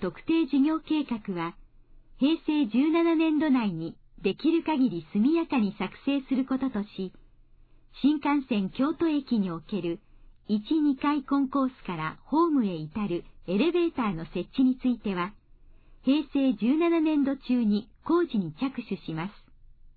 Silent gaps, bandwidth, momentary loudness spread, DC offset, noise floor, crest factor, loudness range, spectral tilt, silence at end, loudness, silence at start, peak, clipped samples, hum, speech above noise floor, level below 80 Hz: none; 4.7 kHz; 10 LU; under 0.1%; -55 dBFS; 14 dB; 3 LU; -10 dB/octave; 0.65 s; -27 LUFS; 0 s; -14 dBFS; under 0.1%; none; 29 dB; -54 dBFS